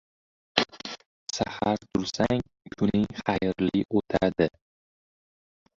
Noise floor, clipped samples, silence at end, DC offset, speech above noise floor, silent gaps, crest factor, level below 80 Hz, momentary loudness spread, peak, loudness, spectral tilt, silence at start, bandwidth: under -90 dBFS; under 0.1%; 1.3 s; under 0.1%; over 64 dB; 1.06-1.26 s; 26 dB; -52 dBFS; 10 LU; -2 dBFS; -27 LUFS; -5.5 dB/octave; 0.55 s; 7.8 kHz